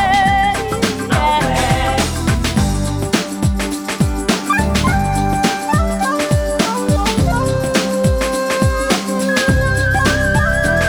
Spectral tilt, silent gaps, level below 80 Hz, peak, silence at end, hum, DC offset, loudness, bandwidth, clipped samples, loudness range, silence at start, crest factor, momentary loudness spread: -5 dB/octave; none; -24 dBFS; 0 dBFS; 0 s; none; under 0.1%; -16 LUFS; over 20 kHz; under 0.1%; 2 LU; 0 s; 14 dB; 4 LU